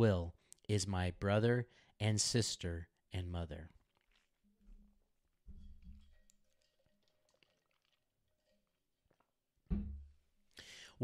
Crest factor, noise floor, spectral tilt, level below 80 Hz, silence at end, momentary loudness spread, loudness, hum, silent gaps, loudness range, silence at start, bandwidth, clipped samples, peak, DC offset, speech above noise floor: 22 dB; -83 dBFS; -5 dB/octave; -56 dBFS; 0 s; 21 LU; -38 LUFS; none; none; 15 LU; 0 s; 13.5 kHz; under 0.1%; -20 dBFS; under 0.1%; 47 dB